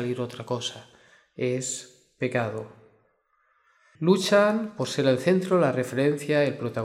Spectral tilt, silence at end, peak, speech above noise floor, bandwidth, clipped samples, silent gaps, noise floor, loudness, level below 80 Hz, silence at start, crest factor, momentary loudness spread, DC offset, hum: -5 dB/octave; 0 s; -8 dBFS; 44 dB; 15.5 kHz; under 0.1%; none; -68 dBFS; -25 LUFS; -72 dBFS; 0 s; 18 dB; 12 LU; under 0.1%; none